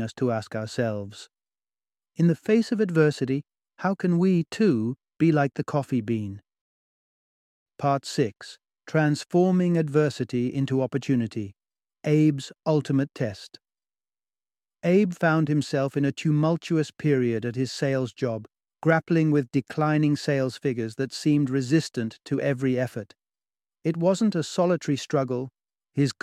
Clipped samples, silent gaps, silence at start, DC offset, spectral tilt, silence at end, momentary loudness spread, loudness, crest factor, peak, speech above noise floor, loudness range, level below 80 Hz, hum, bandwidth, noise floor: under 0.1%; 6.61-7.66 s; 0 s; under 0.1%; -7 dB/octave; 0.1 s; 10 LU; -25 LUFS; 18 dB; -6 dBFS; over 66 dB; 4 LU; -68 dBFS; none; 12.5 kHz; under -90 dBFS